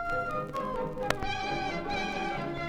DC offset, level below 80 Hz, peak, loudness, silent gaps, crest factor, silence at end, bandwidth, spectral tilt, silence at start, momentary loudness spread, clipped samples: under 0.1%; -46 dBFS; -8 dBFS; -33 LUFS; none; 24 dB; 0 s; 20 kHz; -5 dB/octave; 0 s; 3 LU; under 0.1%